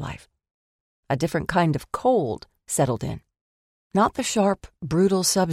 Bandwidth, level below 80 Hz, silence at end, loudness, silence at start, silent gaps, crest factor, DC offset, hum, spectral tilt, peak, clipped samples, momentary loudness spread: 16 kHz; -50 dBFS; 0 s; -23 LUFS; 0 s; 0.51-1.03 s, 3.41-3.90 s; 18 dB; under 0.1%; none; -5 dB/octave; -6 dBFS; under 0.1%; 13 LU